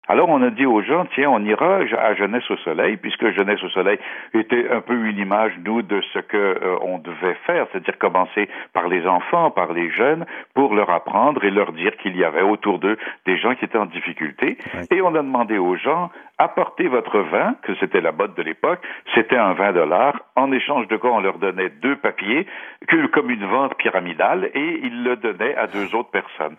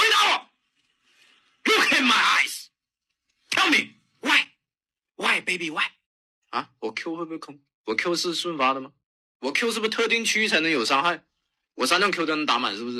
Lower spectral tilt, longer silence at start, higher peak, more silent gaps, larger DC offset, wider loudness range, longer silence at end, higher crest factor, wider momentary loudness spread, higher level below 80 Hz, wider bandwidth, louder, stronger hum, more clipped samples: first, -8 dB/octave vs -1.5 dB/octave; about the same, 0.1 s vs 0 s; first, -2 dBFS vs -8 dBFS; second, none vs 6.06-6.42 s, 7.74-7.84 s, 9.06-9.40 s; neither; second, 2 LU vs 7 LU; about the same, 0.05 s vs 0 s; about the same, 18 dB vs 18 dB; second, 7 LU vs 15 LU; first, -70 dBFS vs -76 dBFS; second, 4 kHz vs 13.5 kHz; about the same, -20 LUFS vs -22 LUFS; neither; neither